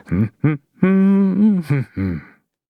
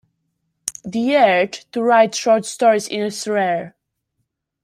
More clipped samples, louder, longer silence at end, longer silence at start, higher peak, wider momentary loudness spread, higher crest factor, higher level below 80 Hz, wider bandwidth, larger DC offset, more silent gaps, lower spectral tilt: neither; about the same, -17 LUFS vs -17 LUFS; second, 0.45 s vs 0.95 s; second, 0.1 s vs 0.65 s; about the same, -2 dBFS vs 0 dBFS; second, 10 LU vs 13 LU; about the same, 16 dB vs 18 dB; first, -46 dBFS vs -66 dBFS; second, 4.9 kHz vs 15.5 kHz; neither; neither; first, -10.5 dB/octave vs -3.5 dB/octave